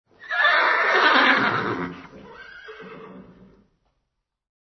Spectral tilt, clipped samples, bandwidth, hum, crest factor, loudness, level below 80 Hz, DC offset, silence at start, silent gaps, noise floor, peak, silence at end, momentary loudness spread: -4.5 dB/octave; under 0.1%; 6.4 kHz; none; 20 dB; -19 LUFS; -64 dBFS; under 0.1%; 0.25 s; none; -77 dBFS; -4 dBFS; 1.45 s; 25 LU